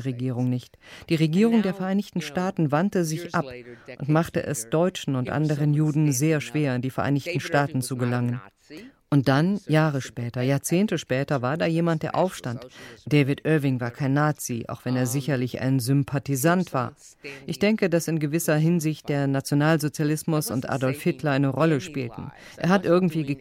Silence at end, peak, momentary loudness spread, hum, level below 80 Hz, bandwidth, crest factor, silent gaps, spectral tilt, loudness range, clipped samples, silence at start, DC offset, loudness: 0 s; -8 dBFS; 11 LU; none; -60 dBFS; 16 kHz; 16 dB; none; -6 dB/octave; 2 LU; under 0.1%; 0 s; under 0.1%; -24 LUFS